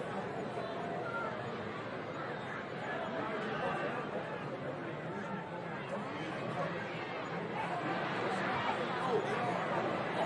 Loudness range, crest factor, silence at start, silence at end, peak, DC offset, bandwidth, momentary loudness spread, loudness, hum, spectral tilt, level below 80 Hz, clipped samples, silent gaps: 4 LU; 16 dB; 0 s; 0 s; -22 dBFS; under 0.1%; 11 kHz; 7 LU; -38 LUFS; none; -6 dB/octave; -72 dBFS; under 0.1%; none